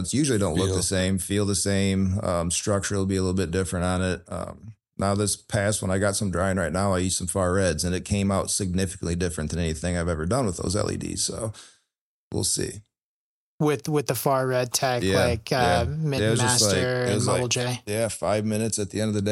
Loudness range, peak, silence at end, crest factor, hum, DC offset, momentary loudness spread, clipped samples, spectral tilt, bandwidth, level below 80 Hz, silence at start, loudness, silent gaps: 5 LU; -6 dBFS; 0 s; 18 dB; none; under 0.1%; 6 LU; under 0.1%; -4.5 dB/octave; 16 kHz; -46 dBFS; 0 s; -24 LUFS; 12.01-12.31 s, 13.02-13.58 s